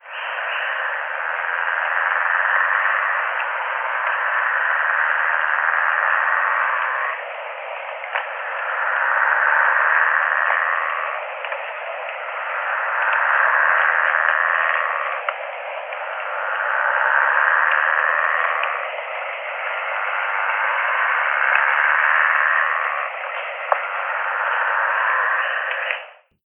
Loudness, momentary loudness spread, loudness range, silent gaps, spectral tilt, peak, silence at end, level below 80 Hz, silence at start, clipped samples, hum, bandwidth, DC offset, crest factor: -19 LUFS; 11 LU; 3 LU; none; 0 dB/octave; 0 dBFS; 0.35 s; under -90 dBFS; 0.05 s; under 0.1%; none; 3.8 kHz; under 0.1%; 20 dB